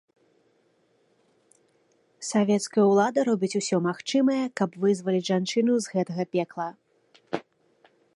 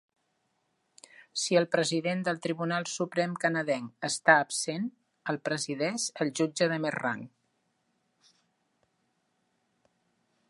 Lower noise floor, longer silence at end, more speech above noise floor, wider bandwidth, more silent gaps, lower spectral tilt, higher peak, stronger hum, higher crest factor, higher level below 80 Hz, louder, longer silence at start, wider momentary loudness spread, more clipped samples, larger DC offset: second, -67 dBFS vs -76 dBFS; second, 0.75 s vs 3.25 s; second, 42 dB vs 47 dB; about the same, 11.5 kHz vs 11.5 kHz; neither; first, -5.5 dB/octave vs -3.5 dB/octave; about the same, -8 dBFS vs -8 dBFS; neither; second, 18 dB vs 24 dB; about the same, -78 dBFS vs -82 dBFS; first, -25 LUFS vs -29 LUFS; first, 2.2 s vs 1.2 s; first, 14 LU vs 10 LU; neither; neither